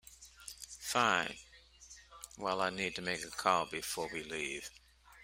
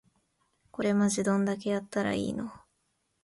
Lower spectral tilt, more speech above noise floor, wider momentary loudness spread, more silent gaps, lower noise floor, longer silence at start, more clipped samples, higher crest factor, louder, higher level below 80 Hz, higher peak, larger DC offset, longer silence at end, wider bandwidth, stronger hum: second, -2.5 dB/octave vs -5.5 dB/octave; second, 23 dB vs 48 dB; first, 20 LU vs 12 LU; neither; second, -58 dBFS vs -76 dBFS; second, 0.05 s vs 0.8 s; neither; first, 26 dB vs 16 dB; second, -35 LUFS vs -29 LUFS; about the same, -66 dBFS vs -64 dBFS; about the same, -12 dBFS vs -14 dBFS; neither; second, 0 s vs 0.65 s; first, 16 kHz vs 11.5 kHz; neither